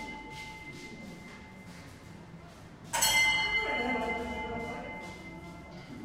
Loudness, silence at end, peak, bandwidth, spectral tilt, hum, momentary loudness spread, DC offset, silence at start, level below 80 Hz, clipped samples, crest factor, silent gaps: -30 LUFS; 0 s; -14 dBFS; 16 kHz; -1.5 dB/octave; none; 24 LU; under 0.1%; 0 s; -54 dBFS; under 0.1%; 22 dB; none